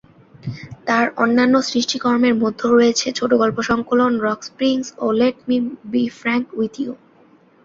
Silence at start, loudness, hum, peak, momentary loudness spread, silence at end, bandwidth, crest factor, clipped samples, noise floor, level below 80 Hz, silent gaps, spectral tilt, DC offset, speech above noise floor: 0.45 s; -18 LUFS; none; -2 dBFS; 13 LU; 0.7 s; 7.6 kHz; 16 dB; under 0.1%; -51 dBFS; -56 dBFS; none; -4.5 dB/octave; under 0.1%; 34 dB